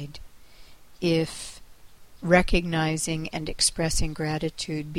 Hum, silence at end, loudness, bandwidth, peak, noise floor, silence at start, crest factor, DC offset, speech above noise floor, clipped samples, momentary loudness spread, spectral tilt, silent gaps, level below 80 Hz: none; 0 s; -25 LUFS; 16 kHz; -6 dBFS; -51 dBFS; 0 s; 20 dB; 0.4%; 26 dB; under 0.1%; 13 LU; -4 dB/octave; none; -36 dBFS